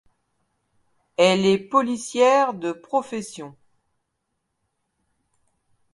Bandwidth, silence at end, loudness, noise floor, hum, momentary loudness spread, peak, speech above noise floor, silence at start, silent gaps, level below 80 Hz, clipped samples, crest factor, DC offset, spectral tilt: 11.5 kHz; 2.45 s; -20 LUFS; -77 dBFS; none; 17 LU; -4 dBFS; 56 dB; 1.2 s; none; -70 dBFS; under 0.1%; 20 dB; under 0.1%; -4.5 dB/octave